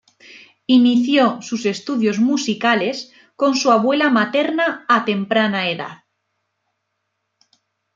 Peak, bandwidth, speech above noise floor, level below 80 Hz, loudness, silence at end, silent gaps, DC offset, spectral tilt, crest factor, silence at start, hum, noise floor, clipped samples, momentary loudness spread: -2 dBFS; 7.6 kHz; 57 dB; -70 dBFS; -17 LUFS; 2 s; none; under 0.1%; -4.5 dB/octave; 18 dB; 0.35 s; none; -74 dBFS; under 0.1%; 9 LU